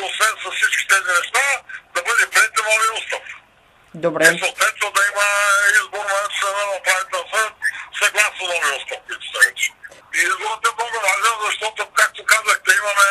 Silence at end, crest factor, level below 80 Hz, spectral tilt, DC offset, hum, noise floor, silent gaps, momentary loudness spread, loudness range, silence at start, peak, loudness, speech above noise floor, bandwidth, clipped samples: 0 s; 18 dB; -66 dBFS; 0 dB/octave; under 0.1%; none; -53 dBFS; none; 9 LU; 2 LU; 0 s; 0 dBFS; -17 LUFS; 33 dB; 15.5 kHz; under 0.1%